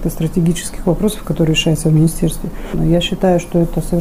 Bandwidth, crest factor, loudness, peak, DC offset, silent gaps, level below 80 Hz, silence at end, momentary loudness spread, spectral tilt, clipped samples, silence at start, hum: 16 kHz; 12 dB; -16 LUFS; -4 dBFS; under 0.1%; none; -26 dBFS; 0 s; 6 LU; -6 dB/octave; under 0.1%; 0 s; none